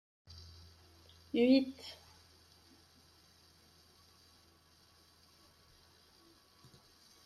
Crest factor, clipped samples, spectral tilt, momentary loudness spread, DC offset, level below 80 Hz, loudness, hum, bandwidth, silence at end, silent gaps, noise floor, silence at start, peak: 24 dB; under 0.1%; -5.5 dB/octave; 32 LU; under 0.1%; -74 dBFS; -33 LUFS; none; 13.5 kHz; 5.3 s; none; -66 dBFS; 0.35 s; -18 dBFS